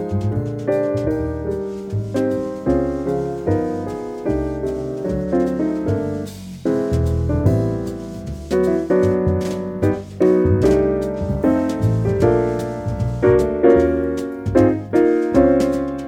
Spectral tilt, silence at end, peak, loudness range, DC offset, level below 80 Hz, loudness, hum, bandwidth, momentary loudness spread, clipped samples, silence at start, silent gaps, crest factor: -8.5 dB/octave; 0 s; -2 dBFS; 5 LU; under 0.1%; -34 dBFS; -19 LUFS; none; 15 kHz; 10 LU; under 0.1%; 0 s; none; 16 dB